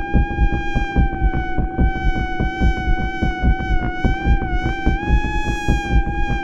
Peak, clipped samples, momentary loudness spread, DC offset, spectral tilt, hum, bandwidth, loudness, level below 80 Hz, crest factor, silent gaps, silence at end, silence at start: -2 dBFS; under 0.1%; 3 LU; under 0.1%; -7 dB/octave; none; 7.8 kHz; -21 LUFS; -20 dBFS; 16 dB; none; 0 s; 0 s